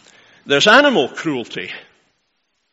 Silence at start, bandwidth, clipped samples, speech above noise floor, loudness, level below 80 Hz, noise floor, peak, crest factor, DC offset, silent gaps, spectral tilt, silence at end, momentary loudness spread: 0.45 s; 9.8 kHz; under 0.1%; 54 dB; -14 LUFS; -64 dBFS; -69 dBFS; 0 dBFS; 18 dB; under 0.1%; none; -3 dB/octave; 0.9 s; 19 LU